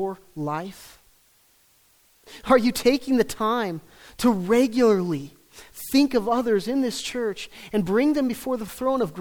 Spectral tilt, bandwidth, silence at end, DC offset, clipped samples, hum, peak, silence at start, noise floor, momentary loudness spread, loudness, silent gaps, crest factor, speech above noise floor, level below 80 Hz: -5 dB/octave; over 20 kHz; 0 s; under 0.1%; under 0.1%; none; -6 dBFS; 0 s; -60 dBFS; 13 LU; -23 LUFS; none; 18 dB; 37 dB; -54 dBFS